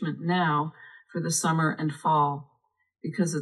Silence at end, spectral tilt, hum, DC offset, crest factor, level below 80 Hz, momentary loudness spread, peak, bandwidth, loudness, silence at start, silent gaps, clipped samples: 0 s; -5 dB/octave; none; under 0.1%; 16 dB; -82 dBFS; 12 LU; -12 dBFS; 12 kHz; -27 LUFS; 0 s; none; under 0.1%